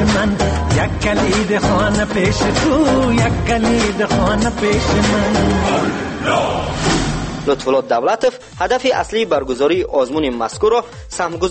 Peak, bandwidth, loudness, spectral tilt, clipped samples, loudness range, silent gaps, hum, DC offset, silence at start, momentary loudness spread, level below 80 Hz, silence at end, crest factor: -4 dBFS; 8.8 kHz; -16 LUFS; -5 dB/octave; under 0.1%; 2 LU; none; none; under 0.1%; 0 s; 5 LU; -28 dBFS; 0 s; 12 dB